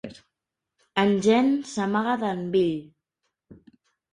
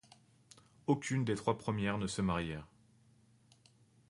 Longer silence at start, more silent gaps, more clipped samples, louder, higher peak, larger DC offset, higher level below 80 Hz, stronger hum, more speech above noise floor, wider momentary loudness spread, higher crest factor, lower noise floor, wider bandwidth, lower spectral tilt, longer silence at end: second, 0.05 s vs 0.9 s; neither; neither; first, -24 LUFS vs -36 LUFS; first, -8 dBFS vs -18 dBFS; neither; second, -66 dBFS vs -60 dBFS; neither; first, 62 dB vs 32 dB; about the same, 9 LU vs 9 LU; about the same, 18 dB vs 22 dB; first, -85 dBFS vs -67 dBFS; about the same, 11 kHz vs 11.5 kHz; about the same, -6 dB/octave vs -6 dB/octave; second, 0.6 s vs 1.45 s